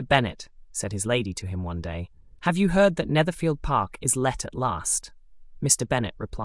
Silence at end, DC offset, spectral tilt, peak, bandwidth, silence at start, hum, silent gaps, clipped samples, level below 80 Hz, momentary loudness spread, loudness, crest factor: 0 s; under 0.1%; -4 dB/octave; -4 dBFS; 12 kHz; 0 s; none; none; under 0.1%; -44 dBFS; 12 LU; -25 LUFS; 20 dB